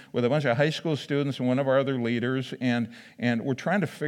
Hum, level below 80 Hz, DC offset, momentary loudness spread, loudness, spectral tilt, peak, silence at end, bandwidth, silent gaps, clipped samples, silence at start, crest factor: none; -80 dBFS; under 0.1%; 6 LU; -27 LUFS; -7 dB/octave; -10 dBFS; 0 s; 12.5 kHz; none; under 0.1%; 0 s; 16 dB